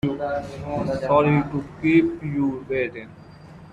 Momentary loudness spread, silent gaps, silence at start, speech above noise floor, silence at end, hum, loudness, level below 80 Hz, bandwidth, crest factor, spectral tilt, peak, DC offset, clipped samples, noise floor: 11 LU; none; 0.05 s; 21 dB; 0 s; none; -23 LUFS; -50 dBFS; 8.2 kHz; 18 dB; -8.5 dB/octave; -6 dBFS; under 0.1%; under 0.1%; -44 dBFS